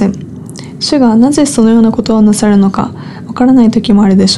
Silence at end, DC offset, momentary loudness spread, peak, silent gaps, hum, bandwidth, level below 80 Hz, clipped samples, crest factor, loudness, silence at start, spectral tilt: 0 s; under 0.1%; 17 LU; 0 dBFS; none; none; 12 kHz; -38 dBFS; under 0.1%; 8 dB; -8 LUFS; 0 s; -5.5 dB/octave